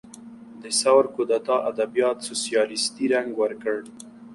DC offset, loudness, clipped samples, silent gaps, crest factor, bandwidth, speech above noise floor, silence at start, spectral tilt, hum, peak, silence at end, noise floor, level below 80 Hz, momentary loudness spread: under 0.1%; -23 LUFS; under 0.1%; none; 18 dB; 11.5 kHz; 20 dB; 0.05 s; -2 dB/octave; none; -6 dBFS; 0 s; -43 dBFS; -70 dBFS; 23 LU